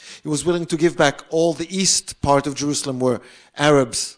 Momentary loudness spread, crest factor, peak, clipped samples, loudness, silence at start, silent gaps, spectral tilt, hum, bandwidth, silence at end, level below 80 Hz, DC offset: 6 LU; 18 dB; -2 dBFS; under 0.1%; -19 LUFS; 0 s; none; -3.5 dB/octave; none; 10.5 kHz; 0.05 s; -48 dBFS; under 0.1%